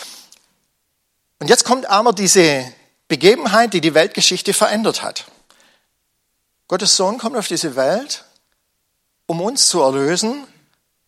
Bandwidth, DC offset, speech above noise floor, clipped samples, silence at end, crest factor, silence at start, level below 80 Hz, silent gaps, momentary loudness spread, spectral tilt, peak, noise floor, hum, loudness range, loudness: 16 kHz; under 0.1%; 54 dB; under 0.1%; 0.65 s; 18 dB; 0 s; -66 dBFS; none; 15 LU; -2.5 dB/octave; 0 dBFS; -69 dBFS; none; 6 LU; -15 LUFS